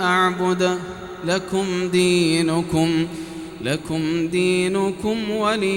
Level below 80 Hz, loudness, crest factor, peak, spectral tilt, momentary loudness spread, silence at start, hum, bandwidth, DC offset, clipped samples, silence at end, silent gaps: -50 dBFS; -21 LUFS; 14 dB; -6 dBFS; -5 dB/octave; 10 LU; 0 s; none; 16.5 kHz; under 0.1%; under 0.1%; 0 s; none